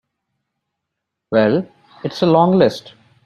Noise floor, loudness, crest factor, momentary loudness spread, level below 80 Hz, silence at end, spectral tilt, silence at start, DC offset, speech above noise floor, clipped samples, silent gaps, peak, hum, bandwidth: -79 dBFS; -16 LUFS; 16 dB; 18 LU; -58 dBFS; 0.45 s; -7.5 dB/octave; 1.3 s; under 0.1%; 64 dB; under 0.1%; none; -2 dBFS; none; 11.5 kHz